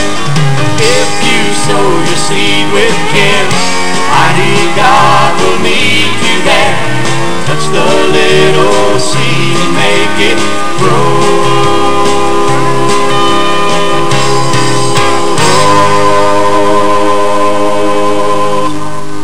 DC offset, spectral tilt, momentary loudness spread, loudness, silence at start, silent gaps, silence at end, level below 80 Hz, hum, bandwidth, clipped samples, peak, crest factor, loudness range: 40%; -4 dB/octave; 4 LU; -9 LUFS; 0 s; none; 0 s; -40 dBFS; none; 11 kHz; 5%; 0 dBFS; 12 dB; 2 LU